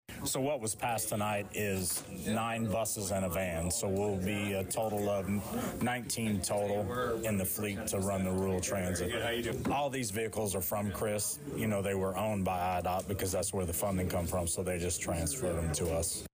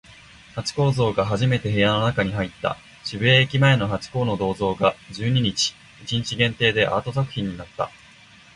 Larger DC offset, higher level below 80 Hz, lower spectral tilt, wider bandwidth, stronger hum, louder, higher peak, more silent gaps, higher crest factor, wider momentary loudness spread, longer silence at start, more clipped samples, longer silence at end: neither; about the same, -52 dBFS vs -48 dBFS; about the same, -4.5 dB/octave vs -5 dB/octave; first, 16 kHz vs 11 kHz; neither; second, -34 LUFS vs -22 LUFS; second, -22 dBFS vs -4 dBFS; neither; second, 10 dB vs 18 dB; second, 2 LU vs 12 LU; about the same, 0.1 s vs 0.1 s; neither; second, 0.05 s vs 0.65 s